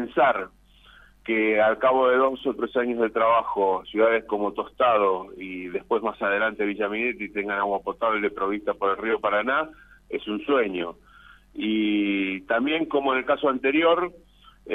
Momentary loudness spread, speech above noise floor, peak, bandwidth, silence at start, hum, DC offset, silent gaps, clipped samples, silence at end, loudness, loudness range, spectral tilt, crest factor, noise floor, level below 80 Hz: 11 LU; 29 dB; -10 dBFS; 4 kHz; 0 s; none; under 0.1%; none; under 0.1%; 0 s; -24 LUFS; 4 LU; -7 dB/octave; 16 dB; -53 dBFS; -58 dBFS